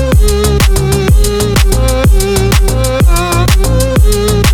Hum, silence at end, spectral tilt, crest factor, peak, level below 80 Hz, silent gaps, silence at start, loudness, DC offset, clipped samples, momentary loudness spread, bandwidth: none; 0 s; -5 dB/octave; 8 dB; 0 dBFS; -10 dBFS; none; 0 s; -10 LUFS; under 0.1%; under 0.1%; 1 LU; 19 kHz